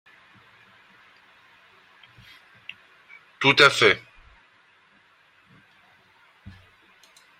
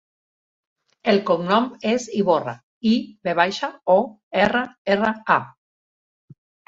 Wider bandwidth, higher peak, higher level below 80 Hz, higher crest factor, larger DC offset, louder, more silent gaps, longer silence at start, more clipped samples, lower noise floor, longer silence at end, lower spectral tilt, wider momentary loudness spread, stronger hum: first, 16 kHz vs 7.8 kHz; about the same, -2 dBFS vs -2 dBFS; second, -66 dBFS vs -60 dBFS; first, 28 dB vs 20 dB; neither; first, -18 LUFS vs -21 LUFS; second, none vs 2.63-2.81 s, 4.23-4.31 s, 4.78-4.85 s; first, 3.4 s vs 1.05 s; neither; second, -59 dBFS vs under -90 dBFS; first, 3.4 s vs 1.2 s; second, -3 dB/octave vs -5.5 dB/octave; first, 28 LU vs 6 LU; neither